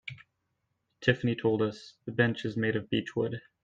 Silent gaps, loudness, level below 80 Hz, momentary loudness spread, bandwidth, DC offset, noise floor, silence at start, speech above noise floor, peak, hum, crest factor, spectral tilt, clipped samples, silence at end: none; -30 LUFS; -66 dBFS; 8 LU; 7.8 kHz; under 0.1%; -80 dBFS; 0.05 s; 50 dB; -8 dBFS; none; 22 dB; -7 dB/octave; under 0.1%; 0.25 s